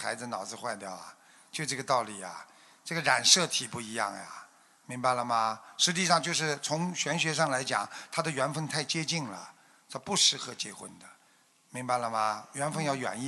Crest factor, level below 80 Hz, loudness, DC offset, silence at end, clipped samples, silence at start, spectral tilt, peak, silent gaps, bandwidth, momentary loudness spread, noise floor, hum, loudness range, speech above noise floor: 26 dB; -76 dBFS; -29 LUFS; under 0.1%; 0 s; under 0.1%; 0 s; -2 dB/octave; -6 dBFS; none; 12 kHz; 19 LU; -65 dBFS; none; 3 LU; 34 dB